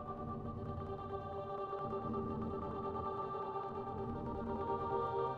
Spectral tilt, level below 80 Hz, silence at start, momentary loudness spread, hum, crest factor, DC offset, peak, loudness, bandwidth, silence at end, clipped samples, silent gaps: -9.5 dB/octave; -58 dBFS; 0 s; 6 LU; none; 16 dB; under 0.1%; -26 dBFS; -42 LUFS; 6.4 kHz; 0 s; under 0.1%; none